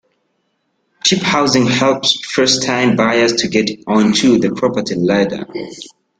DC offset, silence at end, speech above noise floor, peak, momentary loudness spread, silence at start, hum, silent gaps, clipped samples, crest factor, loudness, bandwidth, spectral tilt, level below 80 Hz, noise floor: under 0.1%; 0.35 s; 52 dB; 0 dBFS; 7 LU; 1.05 s; none; none; under 0.1%; 16 dB; -14 LUFS; 11 kHz; -4 dB/octave; -52 dBFS; -66 dBFS